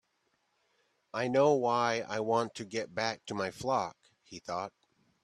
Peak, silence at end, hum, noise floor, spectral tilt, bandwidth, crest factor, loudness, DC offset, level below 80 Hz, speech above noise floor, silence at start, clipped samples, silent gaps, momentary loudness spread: -14 dBFS; 0.55 s; none; -77 dBFS; -4.5 dB/octave; 12.5 kHz; 20 dB; -32 LUFS; under 0.1%; -74 dBFS; 45 dB; 1.15 s; under 0.1%; none; 15 LU